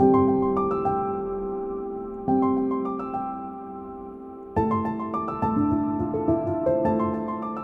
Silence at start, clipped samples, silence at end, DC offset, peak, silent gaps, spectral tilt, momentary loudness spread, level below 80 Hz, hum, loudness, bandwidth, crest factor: 0 s; under 0.1%; 0 s; under 0.1%; -8 dBFS; none; -11 dB/octave; 13 LU; -50 dBFS; none; -25 LUFS; 4.3 kHz; 16 dB